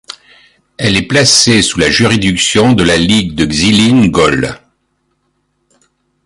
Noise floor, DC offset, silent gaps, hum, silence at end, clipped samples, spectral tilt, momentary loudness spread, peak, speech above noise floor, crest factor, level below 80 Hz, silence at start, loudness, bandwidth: -62 dBFS; under 0.1%; none; none; 1.7 s; under 0.1%; -4 dB/octave; 10 LU; 0 dBFS; 53 dB; 12 dB; -34 dBFS; 0.8 s; -9 LUFS; 16 kHz